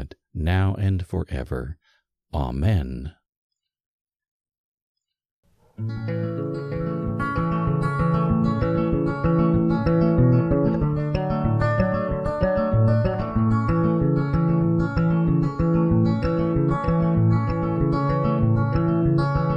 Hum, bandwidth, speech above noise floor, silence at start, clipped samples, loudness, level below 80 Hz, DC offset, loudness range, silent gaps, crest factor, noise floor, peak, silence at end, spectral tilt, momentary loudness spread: none; 5.8 kHz; 43 dB; 0 s; under 0.1%; -22 LUFS; -36 dBFS; under 0.1%; 10 LU; 3.36-3.50 s, 3.80-4.05 s, 4.16-4.20 s, 4.28-4.40 s, 4.58-4.95 s, 5.31-5.43 s; 14 dB; -67 dBFS; -8 dBFS; 0 s; -10 dB/octave; 9 LU